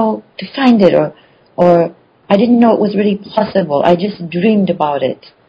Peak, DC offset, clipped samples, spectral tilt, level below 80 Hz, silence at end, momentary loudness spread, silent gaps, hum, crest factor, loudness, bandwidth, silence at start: 0 dBFS; under 0.1%; 0.5%; -8.5 dB/octave; -54 dBFS; 0.35 s; 11 LU; none; none; 12 dB; -13 LUFS; 6.6 kHz; 0 s